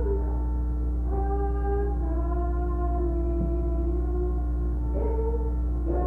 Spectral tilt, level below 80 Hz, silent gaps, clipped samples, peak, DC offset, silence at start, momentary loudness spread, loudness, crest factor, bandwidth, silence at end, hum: -11.5 dB/octave; -26 dBFS; none; under 0.1%; -14 dBFS; under 0.1%; 0 s; 2 LU; -28 LUFS; 10 dB; 1.9 kHz; 0 s; 60 Hz at -25 dBFS